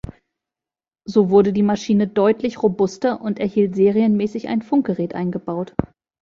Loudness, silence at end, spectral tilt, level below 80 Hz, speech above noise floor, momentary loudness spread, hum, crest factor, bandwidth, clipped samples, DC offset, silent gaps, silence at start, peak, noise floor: -19 LUFS; 0.4 s; -7.5 dB/octave; -50 dBFS; 71 dB; 10 LU; none; 18 dB; 7.4 kHz; under 0.1%; under 0.1%; none; 0.05 s; -2 dBFS; -89 dBFS